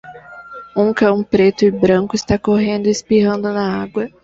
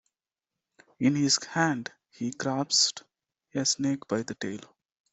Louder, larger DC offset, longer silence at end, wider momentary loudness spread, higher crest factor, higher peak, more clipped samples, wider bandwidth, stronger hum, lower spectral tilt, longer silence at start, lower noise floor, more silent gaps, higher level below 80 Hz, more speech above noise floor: first, -16 LUFS vs -27 LUFS; neither; second, 0.15 s vs 0.45 s; about the same, 13 LU vs 14 LU; second, 14 dB vs 20 dB; first, -2 dBFS vs -10 dBFS; neither; about the same, 7.8 kHz vs 8.2 kHz; neither; first, -6 dB/octave vs -3 dB/octave; second, 0.05 s vs 1 s; second, -36 dBFS vs -90 dBFS; neither; first, -44 dBFS vs -72 dBFS; second, 21 dB vs 62 dB